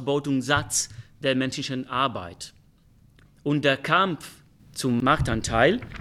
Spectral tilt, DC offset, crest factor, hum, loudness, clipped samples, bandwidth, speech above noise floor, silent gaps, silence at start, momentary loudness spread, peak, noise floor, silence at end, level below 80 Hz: -4 dB/octave; under 0.1%; 20 dB; none; -24 LUFS; under 0.1%; 15 kHz; 32 dB; none; 0 s; 15 LU; -6 dBFS; -57 dBFS; 0 s; -46 dBFS